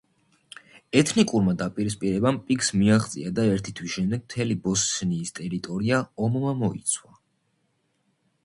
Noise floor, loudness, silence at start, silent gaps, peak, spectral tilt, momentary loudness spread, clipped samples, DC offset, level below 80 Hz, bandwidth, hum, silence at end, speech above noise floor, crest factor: -71 dBFS; -25 LUFS; 0.95 s; none; -6 dBFS; -5 dB/octave; 8 LU; under 0.1%; under 0.1%; -54 dBFS; 11.5 kHz; none; 1.45 s; 47 dB; 20 dB